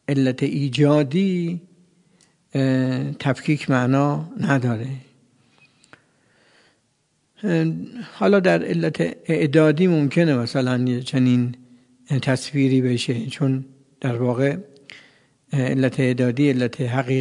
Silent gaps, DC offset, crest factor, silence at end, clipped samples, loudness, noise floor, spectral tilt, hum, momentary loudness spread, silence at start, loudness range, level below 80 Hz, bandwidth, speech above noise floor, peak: none; under 0.1%; 20 dB; 0 s; under 0.1%; -21 LUFS; -67 dBFS; -7 dB/octave; none; 11 LU; 0.1 s; 7 LU; -66 dBFS; 11 kHz; 47 dB; -2 dBFS